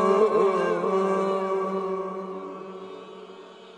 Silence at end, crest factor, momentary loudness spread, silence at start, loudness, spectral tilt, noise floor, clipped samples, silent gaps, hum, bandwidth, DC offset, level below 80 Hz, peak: 0 s; 16 dB; 22 LU; 0 s; -25 LUFS; -6.5 dB/octave; -45 dBFS; under 0.1%; none; none; 9.6 kHz; under 0.1%; -82 dBFS; -10 dBFS